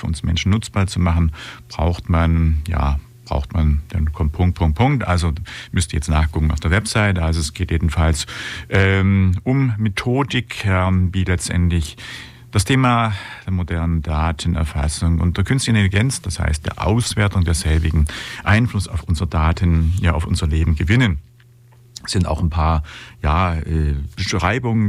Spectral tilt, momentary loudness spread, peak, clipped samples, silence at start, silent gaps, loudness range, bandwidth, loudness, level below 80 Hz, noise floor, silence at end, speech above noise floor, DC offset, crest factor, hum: -5.5 dB/octave; 7 LU; -4 dBFS; under 0.1%; 0 s; none; 2 LU; 13 kHz; -19 LUFS; -26 dBFS; -48 dBFS; 0 s; 30 dB; under 0.1%; 14 dB; none